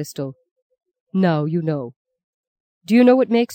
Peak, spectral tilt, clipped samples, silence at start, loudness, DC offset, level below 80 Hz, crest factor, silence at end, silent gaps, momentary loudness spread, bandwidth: -4 dBFS; -7.5 dB/octave; under 0.1%; 0 s; -18 LUFS; under 0.1%; -70 dBFS; 16 dB; 0 s; 0.51-0.56 s, 0.62-0.70 s, 1.00-1.07 s, 1.96-2.05 s, 2.24-2.81 s; 17 LU; 16.5 kHz